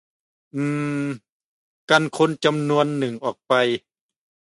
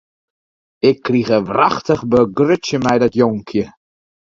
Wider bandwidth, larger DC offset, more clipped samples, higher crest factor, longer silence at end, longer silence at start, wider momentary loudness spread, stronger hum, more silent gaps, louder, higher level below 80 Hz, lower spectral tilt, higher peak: first, 11.5 kHz vs 7.6 kHz; neither; neither; about the same, 20 dB vs 16 dB; about the same, 0.65 s vs 0.65 s; second, 0.55 s vs 0.85 s; first, 10 LU vs 7 LU; neither; first, 1.29-1.88 s vs none; second, -22 LUFS vs -16 LUFS; second, -70 dBFS vs -50 dBFS; about the same, -5.5 dB/octave vs -6.5 dB/octave; about the same, -2 dBFS vs 0 dBFS